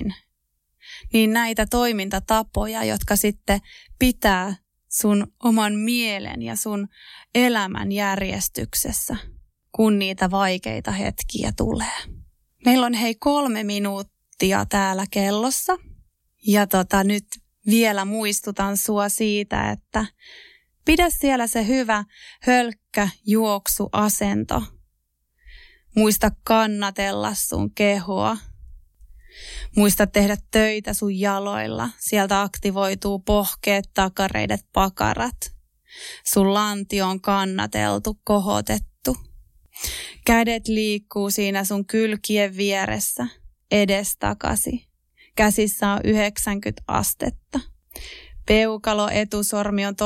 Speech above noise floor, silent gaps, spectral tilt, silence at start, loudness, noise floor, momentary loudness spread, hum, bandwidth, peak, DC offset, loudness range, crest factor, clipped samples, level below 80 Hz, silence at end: 51 dB; none; -4 dB/octave; 0 s; -22 LUFS; -73 dBFS; 10 LU; none; 16.5 kHz; -6 dBFS; under 0.1%; 2 LU; 16 dB; under 0.1%; -40 dBFS; 0 s